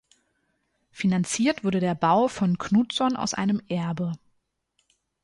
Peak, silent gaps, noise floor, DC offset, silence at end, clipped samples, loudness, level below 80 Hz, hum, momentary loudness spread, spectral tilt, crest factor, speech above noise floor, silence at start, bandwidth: -10 dBFS; none; -73 dBFS; under 0.1%; 1.05 s; under 0.1%; -25 LUFS; -62 dBFS; none; 7 LU; -5.5 dB/octave; 16 dB; 49 dB; 0.95 s; 11.5 kHz